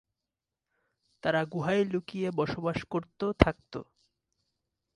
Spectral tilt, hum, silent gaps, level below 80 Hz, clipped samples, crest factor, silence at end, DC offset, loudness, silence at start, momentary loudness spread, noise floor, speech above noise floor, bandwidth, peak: -7 dB/octave; none; none; -46 dBFS; under 0.1%; 30 dB; 1.1 s; under 0.1%; -30 LUFS; 1.25 s; 11 LU; -89 dBFS; 59 dB; 11 kHz; -2 dBFS